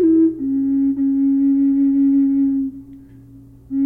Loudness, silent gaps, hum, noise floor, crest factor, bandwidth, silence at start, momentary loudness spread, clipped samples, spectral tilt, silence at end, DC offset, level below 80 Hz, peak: -17 LUFS; none; none; -42 dBFS; 10 dB; 2 kHz; 0 s; 6 LU; under 0.1%; -11.5 dB/octave; 0 s; under 0.1%; -50 dBFS; -8 dBFS